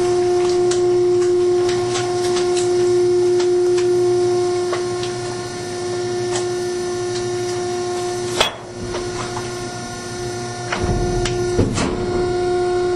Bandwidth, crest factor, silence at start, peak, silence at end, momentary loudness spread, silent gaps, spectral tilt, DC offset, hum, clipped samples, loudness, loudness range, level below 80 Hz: 12 kHz; 16 dB; 0 s; -2 dBFS; 0 s; 10 LU; none; -5 dB/octave; under 0.1%; none; under 0.1%; -19 LUFS; 6 LU; -38 dBFS